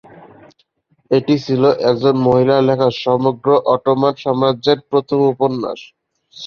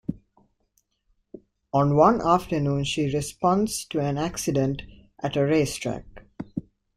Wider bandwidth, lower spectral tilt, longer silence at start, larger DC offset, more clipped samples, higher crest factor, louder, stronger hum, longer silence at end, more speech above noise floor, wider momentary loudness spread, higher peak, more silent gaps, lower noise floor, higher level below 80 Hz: second, 6.8 kHz vs 15.5 kHz; first, -7.5 dB/octave vs -6 dB/octave; first, 1.1 s vs 0.1 s; neither; neither; second, 14 dB vs 22 dB; first, -15 LUFS vs -24 LUFS; neither; second, 0 s vs 0.35 s; about the same, 46 dB vs 48 dB; second, 5 LU vs 17 LU; about the same, -2 dBFS vs -4 dBFS; neither; second, -61 dBFS vs -71 dBFS; second, -56 dBFS vs -50 dBFS